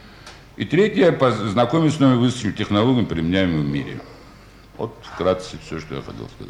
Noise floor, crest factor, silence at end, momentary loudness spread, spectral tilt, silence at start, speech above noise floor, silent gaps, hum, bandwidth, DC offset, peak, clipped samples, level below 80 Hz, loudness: -45 dBFS; 16 dB; 0 s; 16 LU; -6.5 dB/octave; 0.05 s; 25 dB; none; none; 11 kHz; under 0.1%; -4 dBFS; under 0.1%; -46 dBFS; -19 LUFS